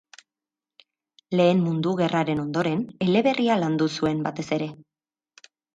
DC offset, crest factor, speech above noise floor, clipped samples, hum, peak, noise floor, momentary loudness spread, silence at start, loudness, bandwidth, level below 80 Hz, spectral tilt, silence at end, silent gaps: under 0.1%; 16 dB; over 67 dB; under 0.1%; none; -8 dBFS; under -90 dBFS; 8 LU; 1.3 s; -24 LUFS; 9 kHz; -62 dBFS; -7 dB/octave; 0.95 s; none